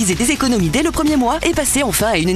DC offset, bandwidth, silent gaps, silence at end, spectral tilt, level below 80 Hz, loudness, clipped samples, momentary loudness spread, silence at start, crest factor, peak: under 0.1%; 14 kHz; none; 0 s; -4 dB/octave; -32 dBFS; -15 LUFS; under 0.1%; 1 LU; 0 s; 14 dB; -2 dBFS